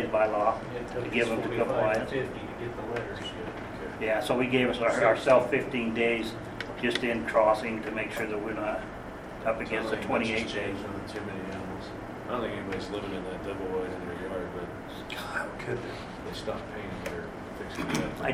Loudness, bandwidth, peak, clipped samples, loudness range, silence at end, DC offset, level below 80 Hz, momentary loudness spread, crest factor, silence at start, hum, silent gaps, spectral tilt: -30 LUFS; 16 kHz; -8 dBFS; under 0.1%; 9 LU; 0 s; under 0.1%; -52 dBFS; 13 LU; 22 dB; 0 s; none; none; -5.5 dB/octave